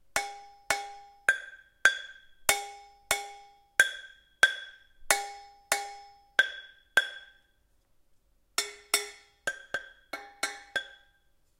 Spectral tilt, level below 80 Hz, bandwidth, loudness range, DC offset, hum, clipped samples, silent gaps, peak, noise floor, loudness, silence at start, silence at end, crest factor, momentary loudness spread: 1.5 dB/octave; -64 dBFS; 16 kHz; 6 LU; under 0.1%; none; under 0.1%; none; -2 dBFS; -68 dBFS; -30 LUFS; 0.15 s; 0.65 s; 30 dB; 20 LU